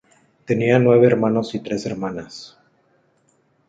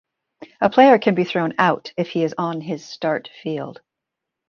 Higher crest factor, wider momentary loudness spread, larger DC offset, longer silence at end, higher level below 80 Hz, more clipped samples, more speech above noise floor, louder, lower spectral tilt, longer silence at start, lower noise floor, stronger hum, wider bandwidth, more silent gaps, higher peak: about the same, 18 dB vs 18 dB; first, 18 LU vs 15 LU; neither; first, 1.2 s vs 0.75 s; first, -58 dBFS vs -66 dBFS; neither; second, 44 dB vs 64 dB; about the same, -18 LUFS vs -19 LUFS; about the same, -7.5 dB/octave vs -6.5 dB/octave; about the same, 0.5 s vs 0.4 s; second, -62 dBFS vs -83 dBFS; neither; first, 7.8 kHz vs 7 kHz; neither; about the same, -2 dBFS vs -2 dBFS